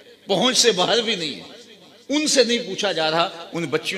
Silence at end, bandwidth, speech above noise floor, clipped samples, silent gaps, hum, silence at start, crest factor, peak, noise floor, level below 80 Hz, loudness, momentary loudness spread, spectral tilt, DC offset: 0 s; 15 kHz; 26 dB; under 0.1%; none; none; 0.3 s; 20 dB; -2 dBFS; -46 dBFS; -66 dBFS; -20 LUFS; 9 LU; -2.5 dB/octave; under 0.1%